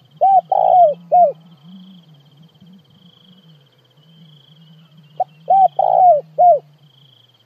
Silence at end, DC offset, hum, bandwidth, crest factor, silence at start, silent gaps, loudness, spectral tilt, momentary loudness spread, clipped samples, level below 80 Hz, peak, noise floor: 0.85 s; under 0.1%; none; 3.6 kHz; 14 dB; 0.2 s; none; -14 LUFS; -8 dB/octave; 8 LU; under 0.1%; -84 dBFS; -4 dBFS; -52 dBFS